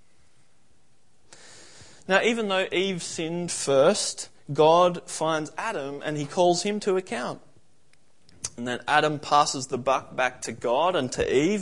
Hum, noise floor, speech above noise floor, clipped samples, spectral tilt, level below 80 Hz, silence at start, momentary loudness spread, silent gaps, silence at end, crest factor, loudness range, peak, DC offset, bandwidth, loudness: none; -66 dBFS; 42 dB; under 0.1%; -3.5 dB/octave; -60 dBFS; 1.5 s; 11 LU; none; 0 s; 22 dB; 5 LU; -4 dBFS; 0.3%; 11 kHz; -25 LUFS